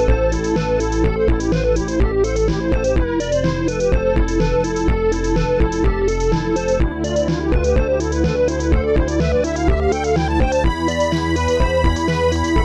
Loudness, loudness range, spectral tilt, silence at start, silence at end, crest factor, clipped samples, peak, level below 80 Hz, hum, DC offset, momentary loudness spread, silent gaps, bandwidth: -18 LUFS; 1 LU; -6.5 dB/octave; 0 s; 0 s; 12 dB; under 0.1%; -4 dBFS; -22 dBFS; none; under 0.1%; 2 LU; none; 10 kHz